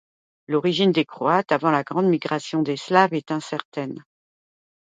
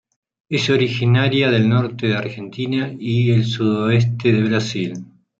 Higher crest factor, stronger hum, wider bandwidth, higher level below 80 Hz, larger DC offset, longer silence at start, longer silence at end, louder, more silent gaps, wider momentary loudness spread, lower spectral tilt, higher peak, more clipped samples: first, 22 dB vs 14 dB; neither; first, 9.2 kHz vs 7.6 kHz; second, -72 dBFS vs -58 dBFS; neither; about the same, 0.5 s vs 0.5 s; first, 0.9 s vs 0.35 s; second, -22 LUFS vs -18 LUFS; first, 3.65-3.72 s vs none; first, 12 LU vs 9 LU; about the same, -6 dB/octave vs -6.5 dB/octave; about the same, -2 dBFS vs -4 dBFS; neither